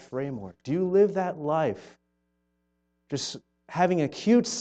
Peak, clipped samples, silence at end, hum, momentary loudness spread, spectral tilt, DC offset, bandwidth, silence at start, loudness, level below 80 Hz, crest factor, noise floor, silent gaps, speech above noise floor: -10 dBFS; under 0.1%; 0 s; 60 Hz at -60 dBFS; 14 LU; -5.5 dB/octave; under 0.1%; 8.8 kHz; 0 s; -27 LUFS; -68 dBFS; 18 dB; -75 dBFS; none; 49 dB